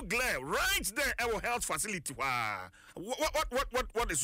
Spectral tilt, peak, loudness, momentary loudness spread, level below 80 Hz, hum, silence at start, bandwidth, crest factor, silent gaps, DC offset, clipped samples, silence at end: -2 dB/octave; -22 dBFS; -33 LUFS; 8 LU; -48 dBFS; none; 0 s; 16 kHz; 12 dB; none; under 0.1%; under 0.1%; 0 s